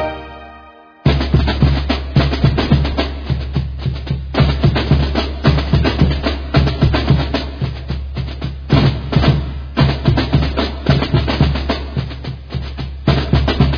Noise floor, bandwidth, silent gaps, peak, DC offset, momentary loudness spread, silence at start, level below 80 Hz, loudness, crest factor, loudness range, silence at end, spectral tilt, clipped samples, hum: -40 dBFS; 5.4 kHz; none; 0 dBFS; under 0.1%; 11 LU; 0 s; -22 dBFS; -17 LUFS; 16 dB; 2 LU; 0 s; -8 dB/octave; under 0.1%; none